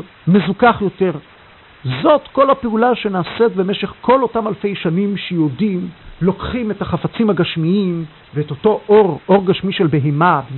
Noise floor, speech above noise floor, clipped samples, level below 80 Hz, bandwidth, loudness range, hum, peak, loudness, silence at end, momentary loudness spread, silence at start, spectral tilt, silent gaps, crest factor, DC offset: -44 dBFS; 28 dB; under 0.1%; -44 dBFS; 4.3 kHz; 3 LU; none; 0 dBFS; -16 LUFS; 0 s; 8 LU; 0 s; -12.5 dB/octave; none; 16 dB; under 0.1%